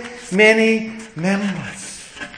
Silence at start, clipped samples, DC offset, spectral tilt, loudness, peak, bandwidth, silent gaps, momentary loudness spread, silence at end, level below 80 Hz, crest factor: 0 s; under 0.1%; under 0.1%; -4.5 dB/octave; -17 LUFS; 0 dBFS; 10.5 kHz; none; 19 LU; 0 s; -56 dBFS; 20 dB